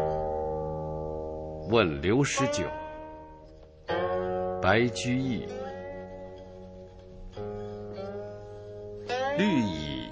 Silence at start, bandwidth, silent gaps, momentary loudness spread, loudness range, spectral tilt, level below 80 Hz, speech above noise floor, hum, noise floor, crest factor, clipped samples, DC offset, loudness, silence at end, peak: 0 s; 8 kHz; none; 21 LU; 11 LU; -5.5 dB/octave; -48 dBFS; 24 dB; none; -50 dBFS; 22 dB; under 0.1%; under 0.1%; -30 LUFS; 0 s; -8 dBFS